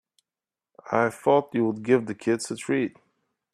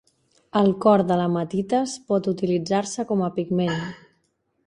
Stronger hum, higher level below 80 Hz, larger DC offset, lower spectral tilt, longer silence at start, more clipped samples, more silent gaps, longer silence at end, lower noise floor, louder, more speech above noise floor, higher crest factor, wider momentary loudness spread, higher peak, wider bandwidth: neither; second, -72 dBFS vs -62 dBFS; neither; about the same, -5.5 dB/octave vs -6.5 dB/octave; first, 0.85 s vs 0.55 s; neither; neither; about the same, 0.65 s vs 0.7 s; first, under -90 dBFS vs -70 dBFS; about the same, -25 LUFS vs -23 LUFS; first, over 66 dB vs 48 dB; about the same, 20 dB vs 18 dB; about the same, 6 LU vs 7 LU; about the same, -6 dBFS vs -4 dBFS; first, 13.5 kHz vs 10.5 kHz